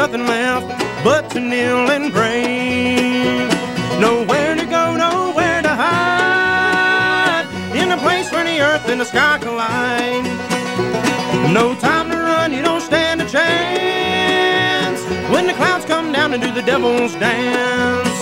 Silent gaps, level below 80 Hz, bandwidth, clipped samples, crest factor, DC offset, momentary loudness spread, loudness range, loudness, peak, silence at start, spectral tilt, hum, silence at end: none; -48 dBFS; 16.5 kHz; under 0.1%; 14 dB; under 0.1%; 5 LU; 2 LU; -16 LUFS; -2 dBFS; 0 s; -4 dB/octave; none; 0 s